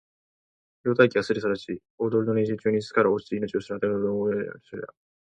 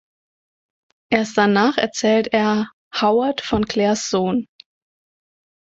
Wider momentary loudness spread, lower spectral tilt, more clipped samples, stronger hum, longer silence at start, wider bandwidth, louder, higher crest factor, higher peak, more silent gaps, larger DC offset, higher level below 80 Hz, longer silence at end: first, 15 LU vs 6 LU; first, -7 dB/octave vs -4.5 dB/octave; neither; neither; second, 0.85 s vs 1.1 s; first, 9.2 kHz vs 8 kHz; second, -25 LUFS vs -19 LUFS; about the same, 22 dB vs 18 dB; about the same, -4 dBFS vs -2 dBFS; second, 1.90-1.98 s vs 2.73-2.91 s; neither; second, -64 dBFS vs -50 dBFS; second, 0.45 s vs 1.15 s